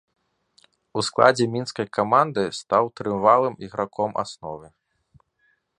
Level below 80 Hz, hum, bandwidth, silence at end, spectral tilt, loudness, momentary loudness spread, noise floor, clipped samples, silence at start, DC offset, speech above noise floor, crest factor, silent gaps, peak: -62 dBFS; none; 11 kHz; 1.15 s; -5 dB/octave; -22 LUFS; 14 LU; -68 dBFS; under 0.1%; 0.95 s; under 0.1%; 46 dB; 24 dB; none; 0 dBFS